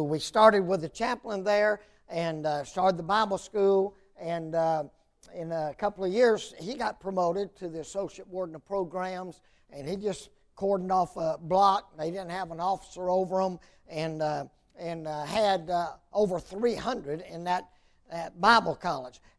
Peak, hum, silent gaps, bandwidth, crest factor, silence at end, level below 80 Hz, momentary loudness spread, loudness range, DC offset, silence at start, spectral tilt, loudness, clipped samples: -6 dBFS; none; none; 11 kHz; 24 dB; 0.2 s; -60 dBFS; 14 LU; 5 LU; under 0.1%; 0 s; -5 dB/octave; -29 LUFS; under 0.1%